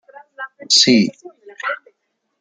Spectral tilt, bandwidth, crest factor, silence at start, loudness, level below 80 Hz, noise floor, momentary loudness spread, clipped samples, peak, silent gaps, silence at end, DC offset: -2.5 dB/octave; 9.6 kHz; 20 dB; 0.4 s; -15 LUFS; -66 dBFS; -70 dBFS; 22 LU; under 0.1%; 0 dBFS; none; 0.65 s; under 0.1%